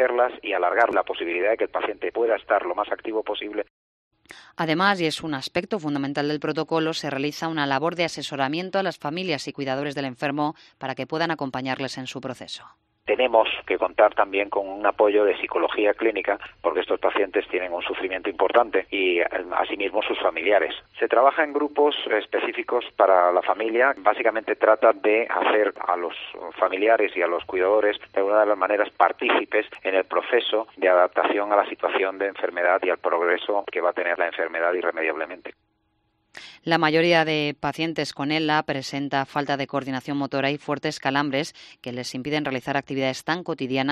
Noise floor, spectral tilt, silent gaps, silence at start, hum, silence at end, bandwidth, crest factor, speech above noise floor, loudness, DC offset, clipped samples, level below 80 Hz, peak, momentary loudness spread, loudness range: -70 dBFS; -5 dB/octave; 3.70-4.11 s; 0 s; none; 0 s; 13 kHz; 20 dB; 47 dB; -23 LUFS; under 0.1%; under 0.1%; -64 dBFS; -4 dBFS; 9 LU; 5 LU